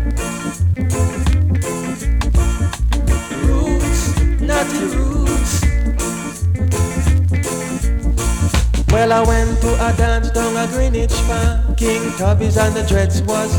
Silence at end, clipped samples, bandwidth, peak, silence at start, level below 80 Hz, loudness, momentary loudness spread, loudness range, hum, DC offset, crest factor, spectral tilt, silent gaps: 0 s; under 0.1%; 18.5 kHz; 0 dBFS; 0 s; -18 dBFS; -17 LUFS; 5 LU; 2 LU; none; under 0.1%; 16 dB; -5.5 dB/octave; none